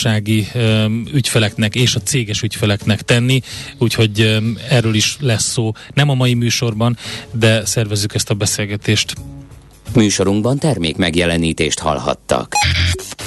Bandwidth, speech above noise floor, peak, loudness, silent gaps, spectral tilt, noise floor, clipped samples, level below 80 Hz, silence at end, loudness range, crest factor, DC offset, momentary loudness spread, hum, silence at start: 12.5 kHz; 22 dB; -2 dBFS; -16 LUFS; none; -4.5 dB/octave; -38 dBFS; under 0.1%; -38 dBFS; 0 s; 2 LU; 14 dB; under 0.1%; 5 LU; none; 0 s